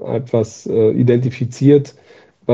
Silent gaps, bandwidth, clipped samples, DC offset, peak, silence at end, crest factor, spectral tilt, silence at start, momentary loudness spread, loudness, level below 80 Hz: none; 7.8 kHz; under 0.1%; under 0.1%; 0 dBFS; 0 s; 14 dB; -8.5 dB/octave; 0 s; 9 LU; -15 LUFS; -58 dBFS